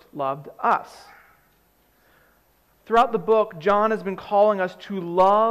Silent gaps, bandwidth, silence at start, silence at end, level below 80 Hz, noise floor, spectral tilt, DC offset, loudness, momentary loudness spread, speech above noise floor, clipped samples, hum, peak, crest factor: none; 12.5 kHz; 0.15 s; 0 s; -58 dBFS; -62 dBFS; -6.5 dB/octave; under 0.1%; -22 LUFS; 10 LU; 41 dB; under 0.1%; 60 Hz at -60 dBFS; -8 dBFS; 16 dB